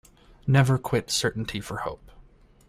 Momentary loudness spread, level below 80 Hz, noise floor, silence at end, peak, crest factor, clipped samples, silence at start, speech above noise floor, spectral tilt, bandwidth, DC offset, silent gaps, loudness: 14 LU; -50 dBFS; -53 dBFS; 0.75 s; -6 dBFS; 20 dB; under 0.1%; 0.45 s; 29 dB; -5 dB/octave; 15 kHz; under 0.1%; none; -26 LUFS